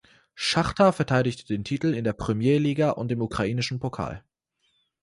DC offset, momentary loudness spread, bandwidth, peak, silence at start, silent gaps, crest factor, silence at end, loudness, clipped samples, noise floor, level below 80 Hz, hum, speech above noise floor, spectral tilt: under 0.1%; 10 LU; 11.5 kHz; -6 dBFS; 0.35 s; none; 18 dB; 0.85 s; -25 LUFS; under 0.1%; -72 dBFS; -50 dBFS; none; 48 dB; -6 dB/octave